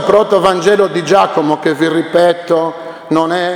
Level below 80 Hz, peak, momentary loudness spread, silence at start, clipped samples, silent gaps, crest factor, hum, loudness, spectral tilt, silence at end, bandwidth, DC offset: -52 dBFS; 0 dBFS; 5 LU; 0 s; 0.2%; none; 12 dB; none; -12 LUFS; -5 dB/octave; 0 s; 16.5 kHz; under 0.1%